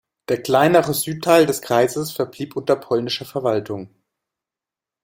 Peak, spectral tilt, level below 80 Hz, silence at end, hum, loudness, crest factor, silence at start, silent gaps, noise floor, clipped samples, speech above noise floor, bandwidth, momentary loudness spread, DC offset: -2 dBFS; -4.5 dB/octave; -60 dBFS; 1.15 s; none; -19 LUFS; 18 dB; 0.3 s; none; -88 dBFS; under 0.1%; 69 dB; 16.5 kHz; 11 LU; under 0.1%